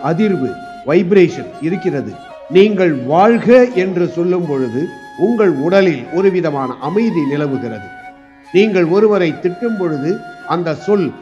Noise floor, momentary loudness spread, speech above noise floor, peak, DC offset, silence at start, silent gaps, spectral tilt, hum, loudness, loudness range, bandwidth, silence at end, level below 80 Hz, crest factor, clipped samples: -38 dBFS; 12 LU; 24 dB; 0 dBFS; under 0.1%; 0 s; none; -7.5 dB/octave; none; -14 LUFS; 3 LU; 8 kHz; 0 s; -58 dBFS; 14 dB; under 0.1%